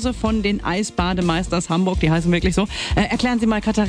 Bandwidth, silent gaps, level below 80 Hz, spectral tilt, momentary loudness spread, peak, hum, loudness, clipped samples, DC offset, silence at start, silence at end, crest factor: 10.5 kHz; none; -30 dBFS; -5.5 dB/octave; 3 LU; -6 dBFS; none; -20 LUFS; under 0.1%; under 0.1%; 0 s; 0 s; 14 dB